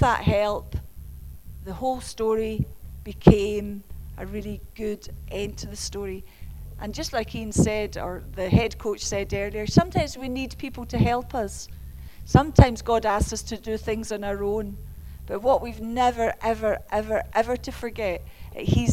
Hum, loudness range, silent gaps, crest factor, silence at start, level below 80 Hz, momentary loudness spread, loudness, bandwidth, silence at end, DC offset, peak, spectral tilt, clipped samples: none; 6 LU; none; 24 dB; 0 s; -36 dBFS; 19 LU; -25 LUFS; 16 kHz; 0 s; under 0.1%; 0 dBFS; -6 dB/octave; under 0.1%